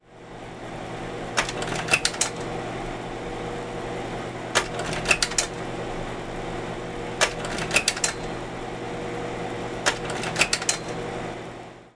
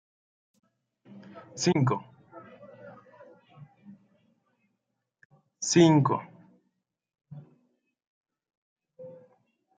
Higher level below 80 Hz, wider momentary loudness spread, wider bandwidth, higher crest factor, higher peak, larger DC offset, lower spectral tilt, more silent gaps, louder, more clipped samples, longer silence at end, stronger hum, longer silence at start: first, -44 dBFS vs -74 dBFS; second, 12 LU vs 29 LU; first, 10.5 kHz vs 9.4 kHz; about the same, 26 dB vs 24 dB; first, -2 dBFS vs -8 dBFS; neither; second, -2.5 dB/octave vs -5.5 dB/octave; second, none vs 5.25-5.30 s, 8.07-8.24 s, 8.57-8.76 s; about the same, -27 LUFS vs -25 LUFS; neither; second, 0.05 s vs 0.7 s; neither; second, 0.05 s vs 1.15 s